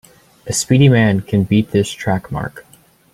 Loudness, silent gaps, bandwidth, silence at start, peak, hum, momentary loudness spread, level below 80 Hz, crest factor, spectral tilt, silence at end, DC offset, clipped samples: -15 LUFS; none; 15.5 kHz; 0.45 s; -2 dBFS; none; 14 LU; -44 dBFS; 16 dB; -5.5 dB/octave; 0.55 s; under 0.1%; under 0.1%